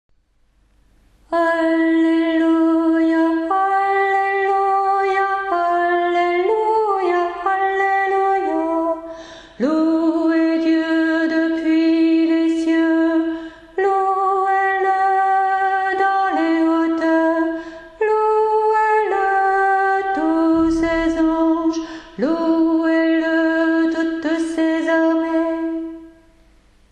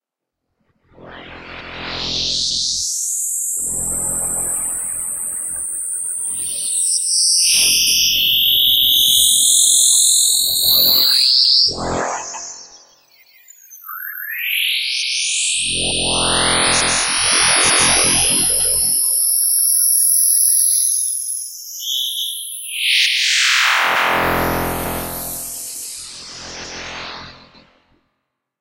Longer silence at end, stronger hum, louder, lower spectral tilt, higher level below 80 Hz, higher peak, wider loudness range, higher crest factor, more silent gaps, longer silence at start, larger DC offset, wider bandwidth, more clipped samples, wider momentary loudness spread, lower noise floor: second, 0.85 s vs 1.25 s; neither; second, -17 LUFS vs -13 LUFS; first, -5 dB/octave vs 0.5 dB/octave; second, -50 dBFS vs -44 dBFS; second, -6 dBFS vs 0 dBFS; second, 2 LU vs 11 LU; second, 10 dB vs 18 dB; neither; first, 1.3 s vs 1 s; neither; second, 8.8 kHz vs 16 kHz; neither; second, 5 LU vs 17 LU; second, -59 dBFS vs -79 dBFS